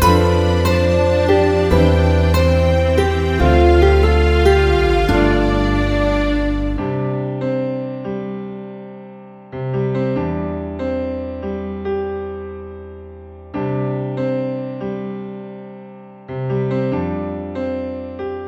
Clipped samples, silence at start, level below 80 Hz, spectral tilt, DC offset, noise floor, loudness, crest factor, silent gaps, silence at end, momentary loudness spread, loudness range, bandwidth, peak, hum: under 0.1%; 0 s; -24 dBFS; -7 dB/octave; under 0.1%; -37 dBFS; -17 LUFS; 16 dB; none; 0 s; 19 LU; 11 LU; 16 kHz; 0 dBFS; none